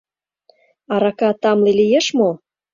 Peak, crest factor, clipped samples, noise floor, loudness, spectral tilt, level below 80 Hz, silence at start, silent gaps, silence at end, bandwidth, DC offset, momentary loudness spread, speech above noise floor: -4 dBFS; 14 dB; under 0.1%; -58 dBFS; -16 LUFS; -5 dB/octave; -62 dBFS; 0.9 s; none; 0.35 s; 7.6 kHz; under 0.1%; 7 LU; 43 dB